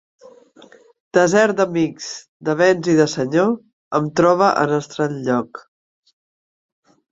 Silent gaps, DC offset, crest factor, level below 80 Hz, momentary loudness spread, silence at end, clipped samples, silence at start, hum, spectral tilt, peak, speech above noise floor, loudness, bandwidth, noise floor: 2.28-2.40 s, 3.73-3.91 s; under 0.1%; 18 dB; -62 dBFS; 13 LU; 1.5 s; under 0.1%; 1.15 s; none; -5.5 dB/octave; -2 dBFS; 31 dB; -18 LUFS; 8 kHz; -48 dBFS